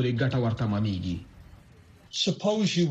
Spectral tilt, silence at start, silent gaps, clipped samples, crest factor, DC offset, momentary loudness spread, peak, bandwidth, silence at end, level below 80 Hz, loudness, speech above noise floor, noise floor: -5.5 dB/octave; 0 s; none; under 0.1%; 14 dB; under 0.1%; 10 LU; -14 dBFS; 8.6 kHz; 0 s; -52 dBFS; -28 LUFS; 27 dB; -54 dBFS